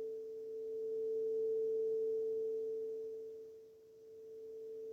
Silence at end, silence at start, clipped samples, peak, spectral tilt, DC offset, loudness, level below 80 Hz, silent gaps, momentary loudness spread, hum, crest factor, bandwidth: 0 s; 0 s; under 0.1%; -32 dBFS; -6.5 dB/octave; under 0.1%; -40 LUFS; -88 dBFS; none; 19 LU; none; 8 dB; 6.4 kHz